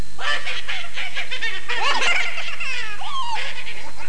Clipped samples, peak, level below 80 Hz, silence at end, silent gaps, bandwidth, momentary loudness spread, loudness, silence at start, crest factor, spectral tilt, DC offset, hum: under 0.1%; -6 dBFS; -54 dBFS; 0 s; none; 10.5 kHz; 9 LU; -24 LUFS; 0 s; 16 dB; -1.5 dB/octave; 20%; 50 Hz at -55 dBFS